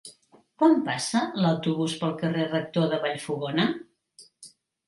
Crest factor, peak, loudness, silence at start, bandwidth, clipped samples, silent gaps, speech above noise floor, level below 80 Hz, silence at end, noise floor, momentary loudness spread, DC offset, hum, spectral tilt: 20 dB; -8 dBFS; -26 LUFS; 0.05 s; 11.5 kHz; under 0.1%; none; 33 dB; -70 dBFS; 0.4 s; -58 dBFS; 7 LU; under 0.1%; none; -5.5 dB/octave